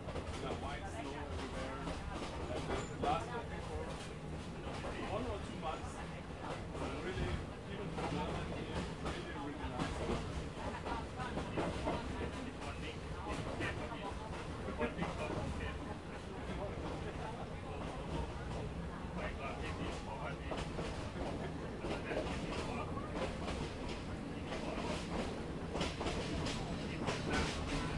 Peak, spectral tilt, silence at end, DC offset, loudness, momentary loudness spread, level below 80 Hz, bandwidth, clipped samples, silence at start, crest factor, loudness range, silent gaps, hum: -22 dBFS; -5.5 dB/octave; 0 s; under 0.1%; -42 LUFS; 5 LU; -50 dBFS; 11.5 kHz; under 0.1%; 0 s; 20 dB; 2 LU; none; none